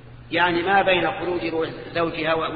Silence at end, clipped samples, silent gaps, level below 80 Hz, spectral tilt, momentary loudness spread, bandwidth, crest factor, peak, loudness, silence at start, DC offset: 0 s; under 0.1%; none; -48 dBFS; -8 dB/octave; 9 LU; 5 kHz; 16 dB; -6 dBFS; -22 LUFS; 0 s; under 0.1%